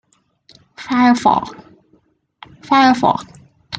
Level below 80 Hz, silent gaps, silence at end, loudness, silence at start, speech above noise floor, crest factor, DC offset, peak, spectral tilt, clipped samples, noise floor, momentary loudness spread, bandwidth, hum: -56 dBFS; none; 0 s; -15 LUFS; 0.8 s; 44 dB; 16 dB; under 0.1%; -2 dBFS; -5 dB/octave; under 0.1%; -58 dBFS; 14 LU; 9 kHz; none